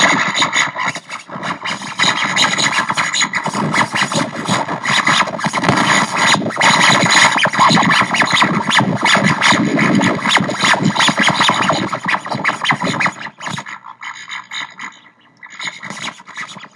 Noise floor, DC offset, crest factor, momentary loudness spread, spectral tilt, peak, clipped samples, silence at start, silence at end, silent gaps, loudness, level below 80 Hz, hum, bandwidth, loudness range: -46 dBFS; under 0.1%; 16 dB; 16 LU; -3 dB/octave; 0 dBFS; under 0.1%; 0 s; 0.1 s; none; -13 LUFS; -60 dBFS; none; 12 kHz; 10 LU